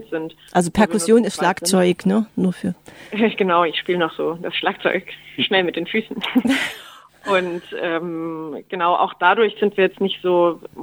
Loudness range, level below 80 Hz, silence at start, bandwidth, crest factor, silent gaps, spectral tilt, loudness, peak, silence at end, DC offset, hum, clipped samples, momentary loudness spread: 3 LU; -56 dBFS; 0 s; 20 kHz; 18 dB; none; -4.5 dB/octave; -19 LUFS; -2 dBFS; 0 s; under 0.1%; none; under 0.1%; 12 LU